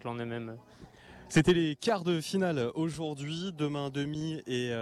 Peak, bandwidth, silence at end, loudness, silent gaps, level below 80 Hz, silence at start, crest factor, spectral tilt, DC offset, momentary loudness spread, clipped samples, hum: -12 dBFS; 13.5 kHz; 0 s; -31 LUFS; none; -60 dBFS; 0 s; 18 dB; -5.5 dB/octave; under 0.1%; 11 LU; under 0.1%; none